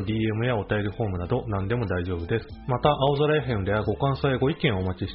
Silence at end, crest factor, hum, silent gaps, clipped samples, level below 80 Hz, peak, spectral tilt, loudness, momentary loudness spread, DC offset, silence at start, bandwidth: 0 s; 18 dB; none; none; under 0.1%; -44 dBFS; -6 dBFS; -5.5 dB/octave; -26 LUFS; 7 LU; under 0.1%; 0 s; 5.6 kHz